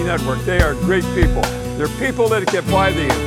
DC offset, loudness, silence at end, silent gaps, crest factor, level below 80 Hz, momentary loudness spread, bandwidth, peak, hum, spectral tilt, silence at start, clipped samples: under 0.1%; -18 LUFS; 0 s; none; 16 dB; -26 dBFS; 5 LU; 17 kHz; -2 dBFS; none; -5.5 dB/octave; 0 s; under 0.1%